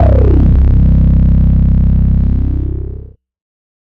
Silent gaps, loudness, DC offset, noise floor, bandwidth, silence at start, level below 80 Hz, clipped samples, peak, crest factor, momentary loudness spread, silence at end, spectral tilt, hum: none; -11 LUFS; under 0.1%; -29 dBFS; 2.8 kHz; 0 s; -10 dBFS; under 0.1%; -2 dBFS; 8 dB; 12 LU; 0.8 s; -12 dB/octave; none